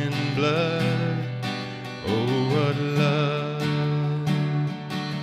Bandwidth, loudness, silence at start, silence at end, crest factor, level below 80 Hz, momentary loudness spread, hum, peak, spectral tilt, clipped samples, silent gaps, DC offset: 14 kHz; -25 LUFS; 0 s; 0 s; 14 dB; -60 dBFS; 7 LU; none; -10 dBFS; -7 dB/octave; under 0.1%; none; under 0.1%